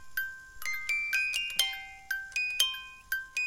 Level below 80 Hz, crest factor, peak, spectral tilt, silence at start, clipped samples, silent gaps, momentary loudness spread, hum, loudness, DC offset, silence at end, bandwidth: -62 dBFS; 26 dB; -8 dBFS; 3 dB/octave; 0 s; under 0.1%; none; 11 LU; none; -31 LUFS; under 0.1%; 0 s; 17 kHz